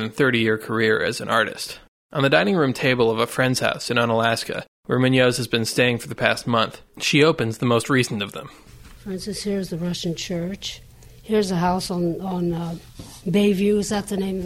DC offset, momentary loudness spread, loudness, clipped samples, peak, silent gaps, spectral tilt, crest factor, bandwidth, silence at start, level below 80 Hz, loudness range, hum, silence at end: under 0.1%; 14 LU; -21 LUFS; under 0.1%; 0 dBFS; 1.88-2.09 s, 4.68-4.83 s; -5 dB/octave; 22 dB; 16.5 kHz; 0 s; -50 dBFS; 6 LU; none; 0 s